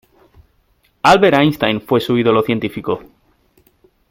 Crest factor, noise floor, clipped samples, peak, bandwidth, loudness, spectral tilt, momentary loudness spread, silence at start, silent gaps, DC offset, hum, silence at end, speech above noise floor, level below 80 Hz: 16 dB; -59 dBFS; under 0.1%; 0 dBFS; 16.5 kHz; -15 LUFS; -6 dB/octave; 12 LU; 1.05 s; none; under 0.1%; none; 1.1 s; 45 dB; -50 dBFS